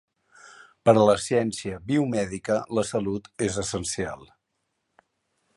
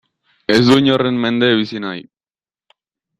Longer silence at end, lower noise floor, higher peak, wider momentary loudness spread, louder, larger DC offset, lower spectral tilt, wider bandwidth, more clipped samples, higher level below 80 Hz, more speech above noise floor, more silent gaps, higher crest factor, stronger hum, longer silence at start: first, 1.3 s vs 1.15 s; second, -78 dBFS vs under -90 dBFS; second, -4 dBFS vs 0 dBFS; second, 12 LU vs 16 LU; second, -25 LUFS vs -14 LUFS; neither; about the same, -5 dB/octave vs -6 dB/octave; about the same, 11.5 kHz vs 12 kHz; neither; about the same, -54 dBFS vs -54 dBFS; second, 54 dB vs over 76 dB; neither; first, 22 dB vs 16 dB; neither; about the same, 0.45 s vs 0.5 s